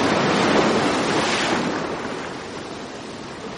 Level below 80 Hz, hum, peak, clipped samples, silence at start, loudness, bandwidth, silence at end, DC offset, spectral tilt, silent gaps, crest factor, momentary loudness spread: -52 dBFS; none; -6 dBFS; under 0.1%; 0 s; -21 LUFS; 10.5 kHz; 0 s; under 0.1%; -4 dB/octave; none; 16 dB; 15 LU